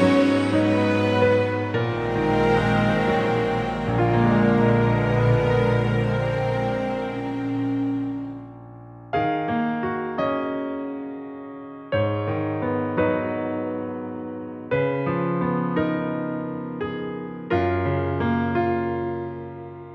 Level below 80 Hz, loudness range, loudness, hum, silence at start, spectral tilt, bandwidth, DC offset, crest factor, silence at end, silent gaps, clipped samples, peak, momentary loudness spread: -44 dBFS; 6 LU; -23 LUFS; none; 0 s; -8 dB/octave; 9.4 kHz; under 0.1%; 16 dB; 0 s; none; under 0.1%; -6 dBFS; 14 LU